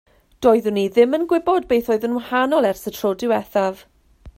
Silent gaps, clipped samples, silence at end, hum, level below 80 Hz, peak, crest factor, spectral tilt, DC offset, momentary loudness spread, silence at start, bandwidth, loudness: none; under 0.1%; 0.05 s; none; -52 dBFS; -2 dBFS; 16 dB; -5.5 dB/octave; under 0.1%; 6 LU; 0.4 s; 16.5 kHz; -19 LUFS